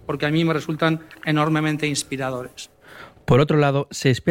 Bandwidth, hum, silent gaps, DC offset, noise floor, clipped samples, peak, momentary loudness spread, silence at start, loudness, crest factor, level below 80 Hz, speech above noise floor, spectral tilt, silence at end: 16 kHz; none; none; under 0.1%; -44 dBFS; under 0.1%; -6 dBFS; 15 LU; 0.05 s; -21 LUFS; 16 dB; -50 dBFS; 24 dB; -5.5 dB/octave; 0 s